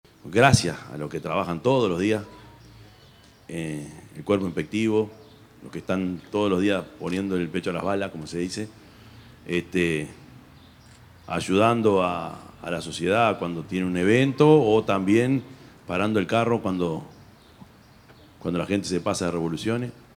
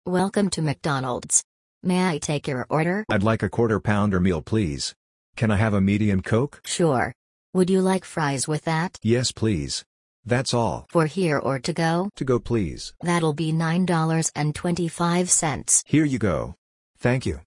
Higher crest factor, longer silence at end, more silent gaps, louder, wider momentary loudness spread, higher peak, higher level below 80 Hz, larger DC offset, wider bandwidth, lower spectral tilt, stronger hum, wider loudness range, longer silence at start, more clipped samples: first, 24 dB vs 18 dB; first, 0.25 s vs 0.05 s; second, none vs 1.44-1.81 s, 4.96-5.33 s, 7.15-7.53 s, 9.86-10.23 s, 16.58-16.94 s; about the same, -24 LUFS vs -23 LUFS; first, 15 LU vs 7 LU; about the same, -2 dBFS vs -4 dBFS; second, -56 dBFS vs -48 dBFS; neither; first, 16 kHz vs 12 kHz; about the same, -6 dB/octave vs -5 dB/octave; neither; first, 8 LU vs 2 LU; first, 0.25 s vs 0.05 s; neither